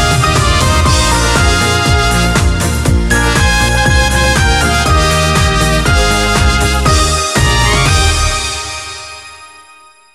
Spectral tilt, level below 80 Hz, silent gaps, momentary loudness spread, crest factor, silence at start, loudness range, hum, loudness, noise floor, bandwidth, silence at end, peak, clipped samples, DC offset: -3.5 dB/octave; -16 dBFS; none; 5 LU; 10 dB; 0 s; 2 LU; none; -10 LUFS; -41 dBFS; 15.5 kHz; 0.55 s; 0 dBFS; under 0.1%; 0.6%